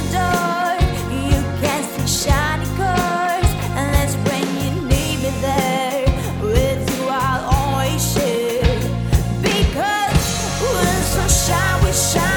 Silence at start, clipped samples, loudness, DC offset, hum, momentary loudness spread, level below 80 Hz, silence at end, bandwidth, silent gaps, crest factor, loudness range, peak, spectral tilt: 0 s; under 0.1%; -18 LUFS; under 0.1%; none; 4 LU; -26 dBFS; 0 s; over 20 kHz; none; 16 dB; 2 LU; -2 dBFS; -4.5 dB/octave